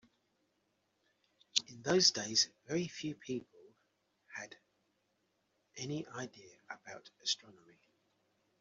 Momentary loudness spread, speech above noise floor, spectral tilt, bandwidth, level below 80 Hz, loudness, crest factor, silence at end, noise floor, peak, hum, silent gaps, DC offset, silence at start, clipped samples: 22 LU; 43 dB; -2.5 dB/octave; 8 kHz; -80 dBFS; -35 LUFS; 30 dB; 1.1 s; -80 dBFS; -12 dBFS; none; none; under 0.1%; 1.55 s; under 0.1%